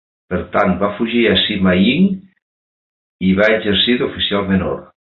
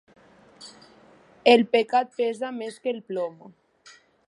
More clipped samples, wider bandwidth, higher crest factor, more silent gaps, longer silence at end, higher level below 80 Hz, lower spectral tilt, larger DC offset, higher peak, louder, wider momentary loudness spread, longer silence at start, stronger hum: neither; second, 5 kHz vs 11.5 kHz; second, 14 dB vs 24 dB; first, 2.42-3.19 s vs none; second, 0.3 s vs 0.8 s; first, -40 dBFS vs -78 dBFS; first, -8 dB/octave vs -4.5 dB/octave; neither; about the same, -2 dBFS vs -2 dBFS; first, -15 LUFS vs -24 LUFS; second, 11 LU vs 27 LU; second, 0.3 s vs 0.6 s; neither